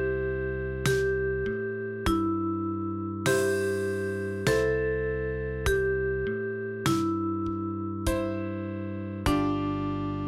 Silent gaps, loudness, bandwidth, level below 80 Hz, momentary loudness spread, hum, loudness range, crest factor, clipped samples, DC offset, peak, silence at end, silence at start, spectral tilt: none; -29 LUFS; 16 kHz; -42 dBFS; 6 LU; none; 2 LU; 20 dB; under 0.1%; under 0.1%; -8 dBFS; 0 s; 0 s; -6 dB/octave